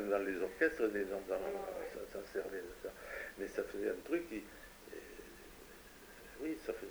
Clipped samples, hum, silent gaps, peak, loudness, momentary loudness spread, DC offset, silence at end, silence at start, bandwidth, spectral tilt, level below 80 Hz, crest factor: under 0.1%; none; none; -20 dBFS; -41 LUFS; 19 LU; under 0.1%; 0 s; 0 s; over 20 kHz; -4.5 dB/octave; -64 dBFS; 22 dB